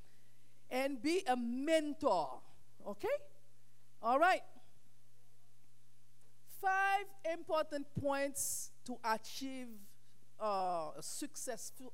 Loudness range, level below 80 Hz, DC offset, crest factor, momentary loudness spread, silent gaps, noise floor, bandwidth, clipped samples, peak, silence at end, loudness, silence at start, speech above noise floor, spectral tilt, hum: 4 LU; -78 dBFS; 0.5%; 20 dB; 13 LU; none; -71 dBFS; 16 kHz; under 0.1%; -20 dBFS; 0.05 s; -38 LUFS; 0.7 s; 34 dB; -3 dB/octave; none